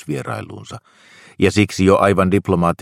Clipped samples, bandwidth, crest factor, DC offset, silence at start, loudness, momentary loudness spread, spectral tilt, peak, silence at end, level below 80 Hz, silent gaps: under 0.1%; 15 kHz; 18 dB; under 0.1%; 0.05 s; -16 LUFS; 21 LU; -6.5 dB/octave; 0 dBFS; 0.05 s; -46 dBFS; none